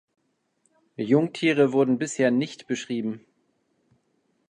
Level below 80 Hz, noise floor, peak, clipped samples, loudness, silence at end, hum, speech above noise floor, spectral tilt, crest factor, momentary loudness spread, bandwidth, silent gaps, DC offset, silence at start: -76 dBFS; -71 dBFS; -8 dBFS; under 0.1%; -24 LUFS; 1.3 s; none; 47 dB; -5.5 dB/octave; 20 dB; 13 LU; 10.5 kHz; none; under 0.1%; 1 s